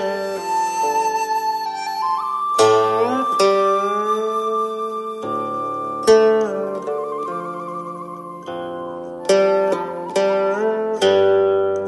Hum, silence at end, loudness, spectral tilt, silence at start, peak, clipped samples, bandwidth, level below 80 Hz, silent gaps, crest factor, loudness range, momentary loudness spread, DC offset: none; 0 s; -19 LUFS; -4 dB/octave; 0 s; -2 dBFS; under 0.1%; 12 kHz; -64 dBFS; none; 18 dB; 4 LU; 14 LU; under 0.1%